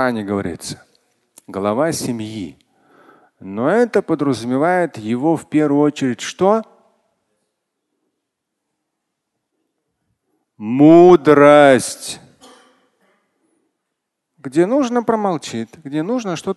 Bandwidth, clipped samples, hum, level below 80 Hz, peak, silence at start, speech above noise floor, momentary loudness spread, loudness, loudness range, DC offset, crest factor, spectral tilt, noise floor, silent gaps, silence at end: 12.5 kHz; under 0.1%; none; -56 dBFS; 0 dBFS; 0 s; 62 dB; 21 LU; -15 LUFS; 11 LU; under 0.1%; 18 dB; -6 dB/octave; -77 dBFS; none; 0.05 s